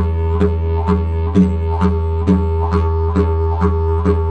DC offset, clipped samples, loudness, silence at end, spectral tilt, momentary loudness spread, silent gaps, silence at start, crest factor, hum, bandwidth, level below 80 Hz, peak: under 0.1%; under 0.1%; -16 LUFS; 0 s; -10 dB/octave; 3 LU; none; 0 s; 14 dB; none; 4.8 kHz; -20 dBFS; -2 dBFS